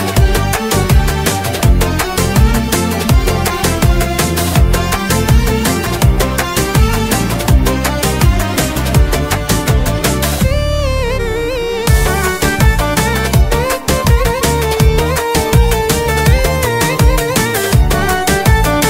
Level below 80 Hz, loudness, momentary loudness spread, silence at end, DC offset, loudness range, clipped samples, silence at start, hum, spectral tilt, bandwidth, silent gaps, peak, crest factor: -16 dBFS; -13 LUFS; 3 LU; 0 s; under 0.1%; 2 LU; under 0.1%; 0 s; none; -4.5 dB/octave; 16.5 kHz; none; 0 dBFS; 12 dB